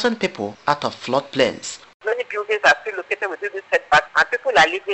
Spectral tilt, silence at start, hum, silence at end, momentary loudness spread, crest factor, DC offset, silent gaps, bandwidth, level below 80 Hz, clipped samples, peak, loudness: -3 dB/octave; 0 s; none; 0 s; 10 LU; 20 dB; under 0.1%; 1.94-2.00 s; 8.4 kHz; -56 dBFS; under 0.1%; 0 dBFS; -20 LUFS